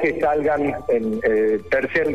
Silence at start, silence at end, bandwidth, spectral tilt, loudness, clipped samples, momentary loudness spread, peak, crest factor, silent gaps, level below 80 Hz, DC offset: 0 s; 0 s; 8.8 kHz; -7 dB/octave; -20 LUFS; under 0.1%; 3 LU; -10 dBFS; 10 dB; none; -48 dBFS; 0.6%